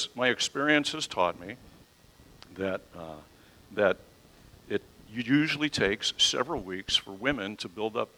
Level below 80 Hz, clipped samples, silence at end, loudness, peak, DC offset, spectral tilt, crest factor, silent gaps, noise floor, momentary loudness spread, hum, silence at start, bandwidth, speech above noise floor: -58 dBFS; under 0.1%; 0.1 s; -28 LUFS; -10 dBFS; under 0.1%; -3 dB/octave; 22 dB; none; -57 dBFS; 19 LU; none; 0 s; 16.5 kHz; 28 dB